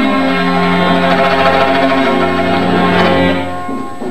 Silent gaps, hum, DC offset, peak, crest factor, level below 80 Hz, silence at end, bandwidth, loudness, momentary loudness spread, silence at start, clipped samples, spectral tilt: none; none; 7%; 0 dBFS; 12 dB; -46 dBFS; 0 s; 13.5 kHz; -12 LUFS; 8 LU; 0 s; under 0.1%; -6.5 dB/octave